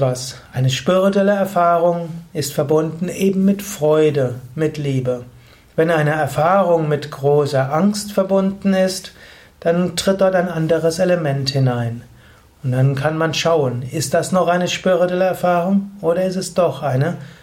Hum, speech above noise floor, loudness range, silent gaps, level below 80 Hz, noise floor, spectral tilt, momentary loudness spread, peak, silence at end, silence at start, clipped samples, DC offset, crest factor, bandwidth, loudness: none; 30 dB; 2 LU; none; -52 dBFS; -47 dBFS; -6 dB/octave; 8 LU; -4 dBFS; 0.1 s; 0 s; under 0.1%; under 0.1%; 14 dB; 16.5 kHz; -18 LUFS